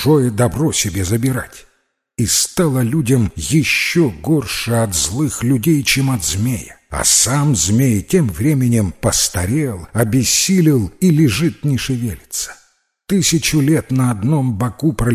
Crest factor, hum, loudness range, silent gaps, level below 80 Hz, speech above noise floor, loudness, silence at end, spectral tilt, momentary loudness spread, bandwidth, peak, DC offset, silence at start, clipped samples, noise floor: 14 dB; none; 2 LU; none; -36 dBFS; 47 dB; -15 LUFS; 0 s; -4.5 dB/octave; 8 LU; 16 kHz; 0 dBFS; under 0.1%; 0 s; under 0.1%; -63 dBFS